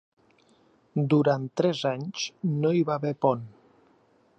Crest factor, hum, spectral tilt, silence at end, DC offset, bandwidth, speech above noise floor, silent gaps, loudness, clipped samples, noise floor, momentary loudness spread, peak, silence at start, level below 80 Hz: 20 dB; none; -6.5 dB/octave; 0.9 s; under 0.1%; 8.2 kHz; 37 dB; none; -26 LUFS; under 0.1%; -63 dBFS; 10 LU; -8 dBFS; 0.95 s; -74 dBFS